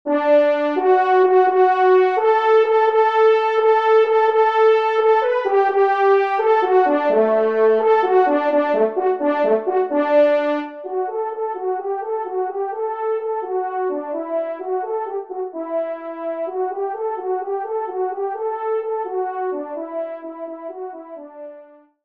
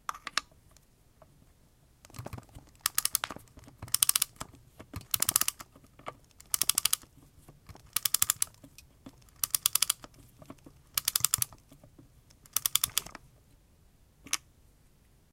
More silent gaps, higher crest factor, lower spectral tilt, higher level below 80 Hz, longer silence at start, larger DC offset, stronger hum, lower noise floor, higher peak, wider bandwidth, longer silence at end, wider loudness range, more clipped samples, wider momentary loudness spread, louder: neither; second, 14 dB vs 36 dB; first, -5.5 dB/octave vs 0.5 dB/octave; second, -74 dBFS vs -60 dBFS; about the same, 0.05 s vs 0.1 s; first, 0.1% vs under 0.1%; neither; second, -45 dBFS vs -63 dBFS; second, -4 dBFS vs 0 dBFS; second, 6 kHz vs 17 kHz; second, 0.4 s vs 0.95 s; first, 10 LU vs 5 LU; neither; second, 13 LU vs 21 LU; first, -18 LUFS vs -29 LUFS